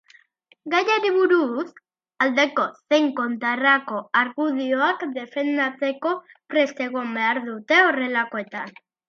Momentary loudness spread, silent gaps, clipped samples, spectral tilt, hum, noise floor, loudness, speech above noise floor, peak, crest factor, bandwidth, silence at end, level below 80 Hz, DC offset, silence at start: 10 LU; none; under 0.1%; -3.5 dB/octave; none; -59 dBFS; -22 LUFS; 37 dB; -4 dBFS; 18 dB; 7 kHz; 0.4 s; -80 dBFS; under 0.1%; 0.65 s